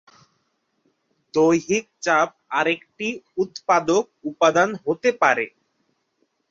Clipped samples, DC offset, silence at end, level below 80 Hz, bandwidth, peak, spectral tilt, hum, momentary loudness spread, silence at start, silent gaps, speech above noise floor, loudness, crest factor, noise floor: under 0.1%; under 0.1%; 1.05 s; -68 dBFS; 7.8 kHz; -2 dBFS; -4 dB/octave; none; 9 LU; 1.35 s; none; 50 dB; -21 LUFS; 20 dB; -71 dBFS